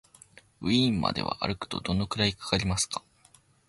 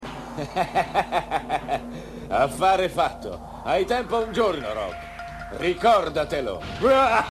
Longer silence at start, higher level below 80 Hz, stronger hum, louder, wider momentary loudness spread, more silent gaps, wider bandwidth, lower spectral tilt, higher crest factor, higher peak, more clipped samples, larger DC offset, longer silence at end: first, 0.6 s vs 0 s; about the same, -48 dBFS vs -44 dBFS; neither; second, -28 LUFS vs -24 LUFS; second, 8 LU vs 16 LU; neither; second, 11.5 kHz vs 13 kHz; about the same, -4 dB/octave vs -5 dB/octave; about the same, 20 dB vs 16 dB; about the same, -10 dBFS vs -8 dBFS; neither; neither; first, 0.7 s vs 0.05 s